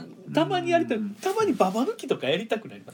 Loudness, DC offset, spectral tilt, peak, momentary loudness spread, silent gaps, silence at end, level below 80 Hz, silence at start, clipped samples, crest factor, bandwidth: -26 LUFS; under 0.1%; -5 dB/octave; -6 dBFS; 6 LU; none; 0 s; -76 dBFS; 0 s; under 0.1%; 20 dB; 19 kHz